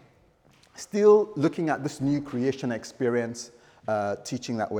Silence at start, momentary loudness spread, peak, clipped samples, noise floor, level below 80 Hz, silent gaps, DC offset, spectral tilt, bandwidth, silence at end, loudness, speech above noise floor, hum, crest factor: 0.75 s; 16 LU; -8 dBFS; under 0.1%; -60 dBFS; -64 dBFS; none; under 0.1%; -6 dB/octave; 11.5 kHz; 0 s; -26 LUFS; 35 dB; none; 18 dB